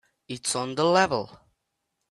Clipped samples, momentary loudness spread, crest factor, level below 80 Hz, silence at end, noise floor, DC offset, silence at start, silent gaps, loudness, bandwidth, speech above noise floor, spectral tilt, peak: under 0.1%; 17 LU; 20 dB; -64 dBFS; 0.75 s; -80 dBFS; under 0.1%; 0.3 s; none; -25 LUFS; 12.5 kHz; 55 dB; -3.5 dB/octave; -6 dBFS